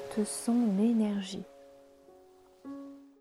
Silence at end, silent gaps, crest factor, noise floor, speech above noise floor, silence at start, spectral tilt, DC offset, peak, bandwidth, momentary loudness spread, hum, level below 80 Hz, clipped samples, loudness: 0.15 s; none; 16 dB; -59 dBFS; 30 dB; 0 s; -5.5 dB/octave; under 0.1%; -18 dBFS; 13.5 kHz; 23 LU; none; -74 dBFS; under 0.1%; -30 LUFS